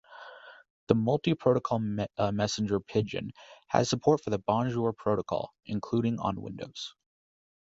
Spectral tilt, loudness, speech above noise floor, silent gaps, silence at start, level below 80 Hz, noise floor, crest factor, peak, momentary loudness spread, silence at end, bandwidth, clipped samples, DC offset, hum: -6 dB/octave; -30 LUFS; 20 dB; 0.70-0.87 s; 0.1 s; -58 dBFS; -49 dBFS; 26 dB; -4 dBFS; 14 LU; 0.85 s; 8 kHz; under 0.1%; under 0.1%; none